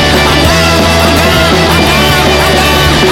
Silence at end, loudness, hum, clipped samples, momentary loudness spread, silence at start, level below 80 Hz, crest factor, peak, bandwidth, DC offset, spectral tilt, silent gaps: 0 s; -6 LUFS; none; 0.3%; 0 LU; 0 s; -18 dBFS; 6 dB; 0 dBFS; 17.5 kHz; under 0.1%; -4 dB/octave; none